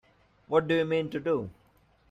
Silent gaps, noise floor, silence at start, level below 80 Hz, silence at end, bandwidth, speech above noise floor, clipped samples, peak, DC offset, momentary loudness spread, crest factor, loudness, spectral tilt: none; -64 dBFS; 0.5 s; -64 dBFS; 0.6 s; 8 kHz; 36 dB; under 0.1%; -12 dBFS; under 0.1%; 6 LU; 18 dB; -28 LUFS; -7.5 dB/octave